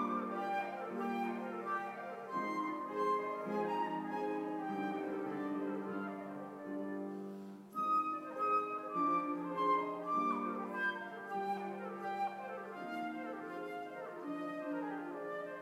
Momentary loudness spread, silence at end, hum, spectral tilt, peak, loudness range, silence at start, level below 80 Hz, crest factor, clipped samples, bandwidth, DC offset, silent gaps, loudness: 10 LU; 0 s; none; -6.5 dB/octave; -24 dBFS; 6 LU; 0 s; under -90 dBFS; 16 dB; under 0.1%; 16 kHz; under 0.1%; none; -39 LUFS